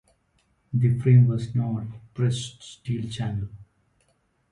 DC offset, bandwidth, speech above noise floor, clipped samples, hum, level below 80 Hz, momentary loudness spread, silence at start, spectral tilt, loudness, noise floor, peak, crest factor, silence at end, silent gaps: under 0.1%; 10.5 kHz; 45 dB; under 0.1%; none; -54 dBFS; 19 LU; 0.75 s; -7.5 dB/octave; -24 LUFS; -68 dBFS; -8 dBFS; 18 dB; 0.9 s; none